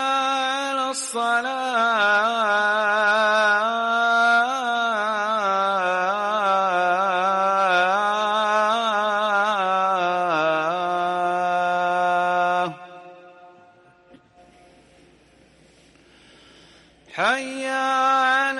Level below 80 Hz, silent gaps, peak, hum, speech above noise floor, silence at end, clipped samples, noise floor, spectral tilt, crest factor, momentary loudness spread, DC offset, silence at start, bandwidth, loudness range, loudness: -70 dBFS; none; -10 dBFS; none; 34 dB; 0 s; under 0.1%; -54 dBFS; -2.5 dB/octave; 12 dB; 5 LU; under 0.1%; 0 s; 11.5 kHz; 8 LU; -20 LUFS